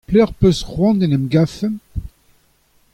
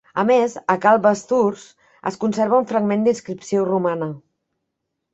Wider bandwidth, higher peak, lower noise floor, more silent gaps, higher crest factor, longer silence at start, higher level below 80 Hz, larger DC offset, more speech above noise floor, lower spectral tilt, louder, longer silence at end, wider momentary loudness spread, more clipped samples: first, 13.5 kHz vs 8.2 kHz; about the same, -2 dBFS vs -2 dBFS; second, -57 dBFS vs -78 dBFS; neither; about the same, 16 dB vs 18 dB; about the same, 0.1 s vs 0.15 s; first, -34 dBFS vs -64 dBFS; neither; second, 42 dB vs 59 dB; first, -7.5 dB/octave vs -6 dB/octave; about the same, -17 LUFS vs -19 LUFS; about the same, 0.85 s vs 0.95 s; about the same, 14 LU vs 13 LU; neither